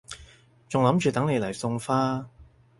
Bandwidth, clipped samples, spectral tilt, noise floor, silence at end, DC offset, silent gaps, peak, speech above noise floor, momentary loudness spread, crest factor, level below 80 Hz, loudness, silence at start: 11.5 kHz; under 0.1%; -6.5 dB/octave; -53 dBFS; 0.35 s; under 0.1%; none; -6 dBFS; 29 dB; 21 LU; 20 dB; -58 dBFS; -26 LUFS; 0.1 s